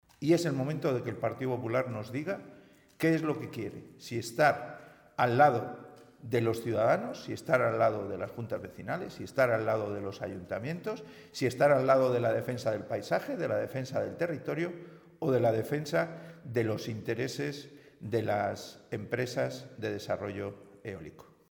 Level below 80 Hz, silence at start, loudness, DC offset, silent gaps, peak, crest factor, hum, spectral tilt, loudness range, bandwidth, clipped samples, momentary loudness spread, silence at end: -70 dBFS; 0.2 s; -31 LUFS; under 0.1%; none; -10 dBFS; 22 dB; none; -6.5 dB/octave; 5 LU; 19 kHz; under 0.1%; 16 LU; 0.3 s